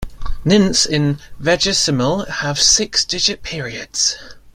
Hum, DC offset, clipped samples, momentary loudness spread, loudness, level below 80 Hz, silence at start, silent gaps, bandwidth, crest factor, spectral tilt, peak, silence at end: none; under 0.1%; under 0.1%; 13 LU; -16 LUFS; -32 dBFS; 0 s; none; 16 kHz; 18 dB; -3 dB/octave; 0 dBFS; 0.15 s